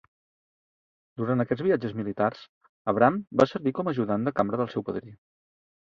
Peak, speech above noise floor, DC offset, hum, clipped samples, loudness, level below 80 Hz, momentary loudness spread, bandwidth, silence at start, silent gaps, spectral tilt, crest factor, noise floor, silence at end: -4 dBFS; over 64 dB; under 0.1%; none; under 0.1%; -27 LUFS; -64 dBFS; 12 LU; 7.4 kHz; 1.2 s; 2.49-2.61 s, 2.69-2.85 s; -8.5 dB/octave; 24 dB; under -90 dBFS; 0.7 s